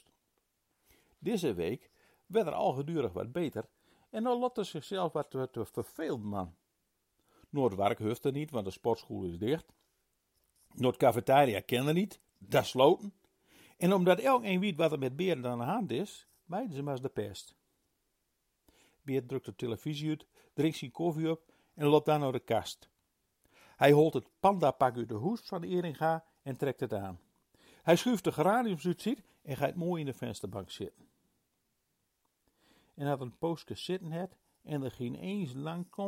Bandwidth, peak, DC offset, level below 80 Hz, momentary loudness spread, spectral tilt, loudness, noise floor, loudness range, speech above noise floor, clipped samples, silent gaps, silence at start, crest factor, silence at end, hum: 16.5 kHz; -10 dBFS; under 0.1%; -70 dBFS; 14 LU; -6.5 dB/octave; -33 LUFS; -80 dBFS; 11 LU; 48 dB; under 0.1%; none; 1.2 s; 24 dB; 0 s; none